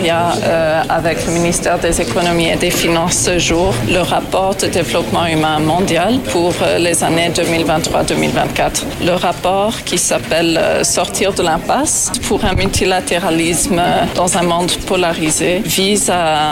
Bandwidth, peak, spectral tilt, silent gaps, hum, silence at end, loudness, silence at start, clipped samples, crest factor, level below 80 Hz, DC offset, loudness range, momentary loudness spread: 16.5 kHz; -4 dBFS; -3.5 dB/octave; none; none; 0 s; -14 LUFS; 0 s; under 0.1%; 10 dB; -32 dBFS; under 0.1%; 1 LU; 3 LU